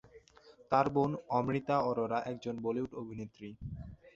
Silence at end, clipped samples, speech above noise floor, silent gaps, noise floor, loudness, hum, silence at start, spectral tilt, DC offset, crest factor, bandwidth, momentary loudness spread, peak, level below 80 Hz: 0.05 s; under 0.1%; 27 dB; none; -61 dBFS; -34 LUFS; none; 0.15 s; -6.5 dB/octave; under 0.1%; 22 dB; 7.6 kHz; 15 LU; -14 dBFS; -60 dBFS